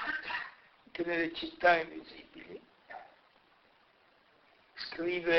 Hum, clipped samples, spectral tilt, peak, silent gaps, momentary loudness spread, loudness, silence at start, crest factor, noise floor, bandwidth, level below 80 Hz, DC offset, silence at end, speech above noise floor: none; under 0.1%; -5.5 dB/octave; -12 dBFS; none; 23 LU; -33 LUFS; 0 s; 24 dB; -66 dBFS; 6.2 kHz; -70 dBFS; under 0.1%; 0 s; 34 dB